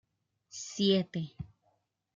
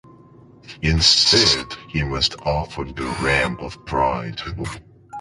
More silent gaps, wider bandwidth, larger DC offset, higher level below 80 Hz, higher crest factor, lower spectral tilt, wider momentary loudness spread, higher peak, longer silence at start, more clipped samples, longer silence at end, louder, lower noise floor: neither; second, 7.6 kHz vs 11.5 kHz; neither; second, -66 dBFS vs -34 dBFS; about the same, 20 dB vs 20 dB; first, -5 dB/octave vs -3 dB/octave; first, 20 LU vs 17 LU; second, -16 dBFS vs -2 dBFS; about the same, 0.55 s vs 0.65 s; neither; first, 0.7 s vs 0 s; second, -31 LUFS vs -19 LUFS; first, -76 dBFS vs -47 dBFS